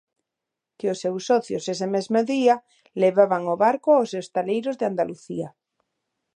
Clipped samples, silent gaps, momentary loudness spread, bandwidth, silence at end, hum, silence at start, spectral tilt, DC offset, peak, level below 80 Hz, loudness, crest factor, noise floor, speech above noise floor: under 0.1%; none; 11 LU; 10.5 kHz; 0.9 s; none; 0.85 s; -5.5 dB/octave; under 0.1%; -4 dBFS; -76 dBFS; -23 LUFS; 20 dB; -85 dBFS; 63 dB